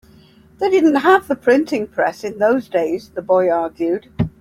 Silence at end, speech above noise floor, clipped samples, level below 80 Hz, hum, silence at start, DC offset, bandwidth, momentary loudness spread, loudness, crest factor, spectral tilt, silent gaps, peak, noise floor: 0.1 s; 31 dB; under 0.1%; -48 dBFS; none; 0.6 s; under 0.1%; 15 kHz; 8 LU; -17 LUFS; 16 dB; -6.5 dB/octave; none; -2 dBFS; -48 dBFS